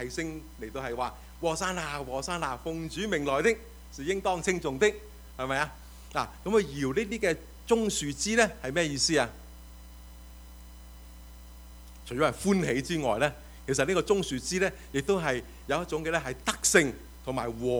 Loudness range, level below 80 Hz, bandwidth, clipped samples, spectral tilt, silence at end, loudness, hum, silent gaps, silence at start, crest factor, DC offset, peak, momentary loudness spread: 5 LU; -48 dBFS; over 20 kHz; under 0.1%; -3.5 dB/octave; 0 s; -29 LUFS; none; none; 0 s; 24 dB; under 0.1%; -6 dBFS; 24 LU